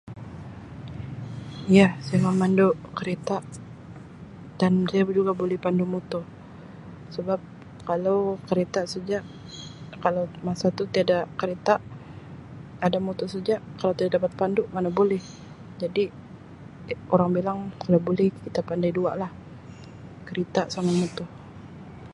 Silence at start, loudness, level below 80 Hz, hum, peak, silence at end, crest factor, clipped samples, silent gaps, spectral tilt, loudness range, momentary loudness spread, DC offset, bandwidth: 0.05 s; -25 LUFS; -56 dBFS; none; -4 dBFS; 0 s; 22 dB; under 0.1%; none; -7 dB/octave; 5 LU; 21 LU; under 0.1%; 11 kHz